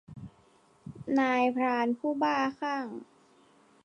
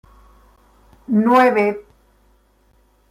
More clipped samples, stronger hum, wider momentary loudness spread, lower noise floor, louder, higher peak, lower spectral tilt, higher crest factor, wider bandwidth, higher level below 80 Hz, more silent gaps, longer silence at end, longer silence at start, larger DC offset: neither; neither; first, 22 LU vs 10 LU; first, -63 dBFS vs -57 dBFS; second, -29 LUFS vs -16 LUFS; second, -14 dBFS vs -4 dBFS; about the same, -6 dB/octave vs -7 dB/octave; about the same, 16 dB vs 18 dB; second, 9.8 kHz vs 15.5 kHz; second, -68 dBFS vs -54 dBFS; neither; second, 0.8 s vs 1.3 s; second, 0.1 s vs 1.1 s; neither